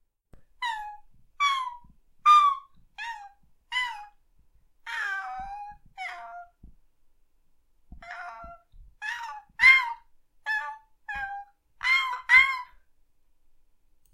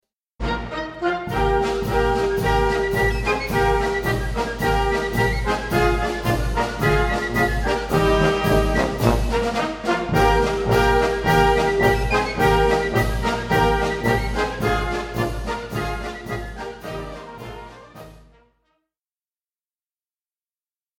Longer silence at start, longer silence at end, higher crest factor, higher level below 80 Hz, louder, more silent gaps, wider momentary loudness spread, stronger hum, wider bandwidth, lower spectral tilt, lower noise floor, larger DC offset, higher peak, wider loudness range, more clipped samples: about the same, 0.35 s vs 0.4 s; second, 1.5 s vs 2.85 s; about the same, 24 dB vs 20 dB; second, -58 dBFS vs -30 dBFS; about the same, -23 LUFS vs -21 LUFS; neither; first, 25 LU vs 12 LU; neither; about the same, 15.5 kHz vs 17 kHz; second, 0.5 dB/octave vs -5.5 dB/octave; second, -63 dBFS vs under -90 dBFS; neither; second, -6 dBFS vs -2 dBFS; first, 17 LU vs 12 LU; neither